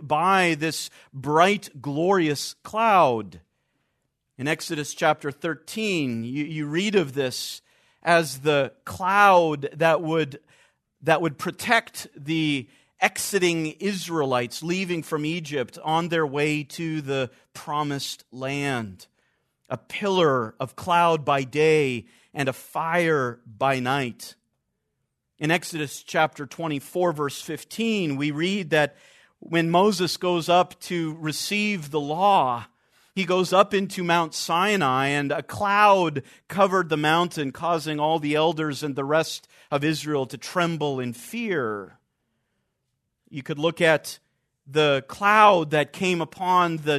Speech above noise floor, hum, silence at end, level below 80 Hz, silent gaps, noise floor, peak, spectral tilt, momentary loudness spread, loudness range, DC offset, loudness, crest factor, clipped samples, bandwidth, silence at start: 54 dB; none; 0 s; -68 dBFS; none; -78 dBFS; -2 dBFS; -4.5 dB/octave; 12 LU; 6 LU; under 0.1%; -23 LUFS; 22 dB; under 0.1%; 14 kHz; 0 s